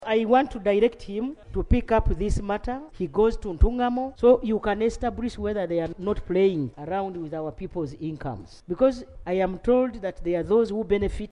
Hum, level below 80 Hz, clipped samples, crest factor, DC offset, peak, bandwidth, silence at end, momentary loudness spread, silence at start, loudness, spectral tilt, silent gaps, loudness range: none; -34 dBFS; under 0.1%; 18 dB; under 0.1%; -6 dBFS; 10.5 kHz; 0.05 s; 11 LU; 0 s; -25 LUFS; -7.5 dB/octave; none; 4 LU